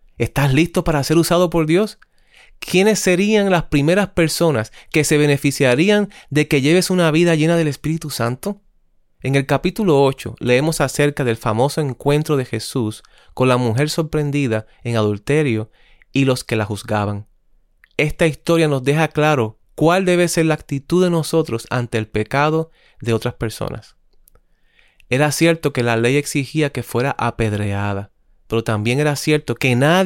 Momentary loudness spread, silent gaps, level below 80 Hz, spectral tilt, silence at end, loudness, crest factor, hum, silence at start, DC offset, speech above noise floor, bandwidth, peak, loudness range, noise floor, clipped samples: 9 LU; none; -42 dBFS; -5.5 dB/octave; 0 s; -18 LUFS; 14 dB; none; 0.2 s; under 0.1%; 39 dB; 17 kHz; -4 dBFS; 5 LU; -57 dBFS; under 0.1%